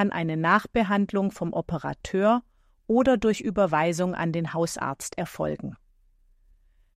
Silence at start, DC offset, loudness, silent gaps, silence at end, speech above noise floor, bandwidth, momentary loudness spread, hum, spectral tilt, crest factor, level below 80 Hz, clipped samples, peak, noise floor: 0 s; under 0.1%; -26 LUFS; none; 1.2 s; 36 dB; 15 kHz; 9 LU; none; -6 dB/octave; 18 dB; -52 dBFS; under 0.1%; -8 dBFS; -61 dBFS